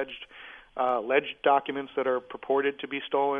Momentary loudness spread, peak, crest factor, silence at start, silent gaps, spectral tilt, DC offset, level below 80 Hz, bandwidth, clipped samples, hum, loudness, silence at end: 16 LU; -10 dBFS; 18 dB; 0 s; none; -6.5 dB/octave; under 0.1%; -68 dBFS; 3.8 kHz; under 0.1%; none; -28 LUFS; 0 s